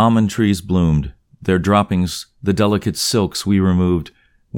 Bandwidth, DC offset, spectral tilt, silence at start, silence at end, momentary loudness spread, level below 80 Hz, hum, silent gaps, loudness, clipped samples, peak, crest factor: 18 kHz; under 0.1%; -6 dB/octave; 0 s; 0 s; 8 LU; -36 dBFS; none; none; -17 LUFS; under 0.1%; -2 dBFS; 14 dB